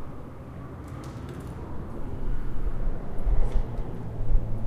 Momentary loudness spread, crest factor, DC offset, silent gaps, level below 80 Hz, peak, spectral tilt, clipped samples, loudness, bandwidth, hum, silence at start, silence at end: 10 LU; 16 dB; under 0.1%; none; -28 dBFS; -10 dBFS; -8.5 dB/octave; under 0.1%; -35 LUFS; 3.6 kHz; none; 0 s; 0 s